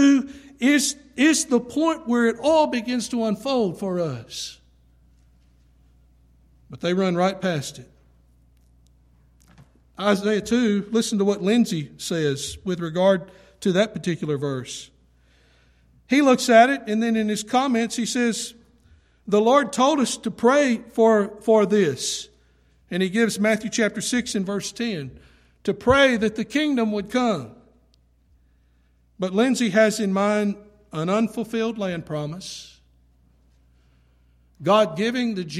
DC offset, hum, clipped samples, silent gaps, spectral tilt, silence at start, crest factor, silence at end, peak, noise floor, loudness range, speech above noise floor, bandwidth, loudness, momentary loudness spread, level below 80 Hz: under 0.1%; none; under 0.1%; none; -4.5 dB/octave; 0 s; 18 dB; 0 s; -4 dBFS; -60 dBFS; 8 LU; 39 dB; 14.5 kHz; -22 LUFS; 12 LU; -56 dBFS